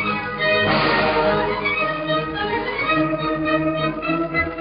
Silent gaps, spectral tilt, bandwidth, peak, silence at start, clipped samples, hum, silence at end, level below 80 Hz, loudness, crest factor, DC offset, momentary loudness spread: none; -3 dB/octave; 5.2 kHz; -4 dBFS; 0 s; under 0.1%; none; 0 s; -44 dBFS; -20 LUFS; 16 dB; under 0.1%; 6 LU